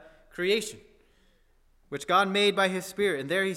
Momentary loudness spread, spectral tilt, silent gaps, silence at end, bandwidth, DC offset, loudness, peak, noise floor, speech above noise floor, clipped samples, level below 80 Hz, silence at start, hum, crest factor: 16 LU; -3.5 dB/octave; none; 0 s; 16 kHz; under 0.1%; -26 LUFS; -10 dBFS; -63 dBFS; 37 dB; under 0.1%; -64 dBFS; 0.35 s; none; 18 dB